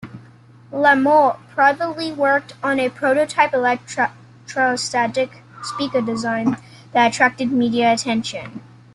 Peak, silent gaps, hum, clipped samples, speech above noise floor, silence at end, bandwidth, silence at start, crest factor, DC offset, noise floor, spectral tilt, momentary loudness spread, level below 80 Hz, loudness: -2 dBFS; none; none; under 0.1%; 28 dB; 0.3 s; 11.5 kHz; 0 s; 18 dB; under 0.1%; -46 dBFS; -4 dB/octave; 14 LU; -62 dBFS; -18 LUFS